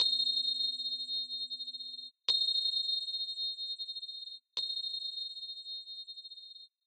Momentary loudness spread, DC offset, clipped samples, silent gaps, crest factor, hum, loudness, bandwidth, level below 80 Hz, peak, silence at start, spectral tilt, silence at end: 15 LU; under 0.1%; under 0.1%; none; 20 dB; none; -33 LUFS; 8.8 kHz; -88 dBFS; -16 dBFS; 0 s; 1.5 dB/octave; 0.2 s